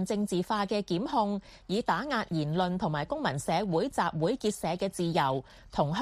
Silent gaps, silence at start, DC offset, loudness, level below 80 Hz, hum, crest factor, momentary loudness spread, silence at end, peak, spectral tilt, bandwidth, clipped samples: none; 0 s; under 0.1%; -30 LUFS; -56 dBFS; none; 18 dB; 4 LU; 0 s; -12 dBFS; -5.5 dB/octave; 15 kHz; under 0.1%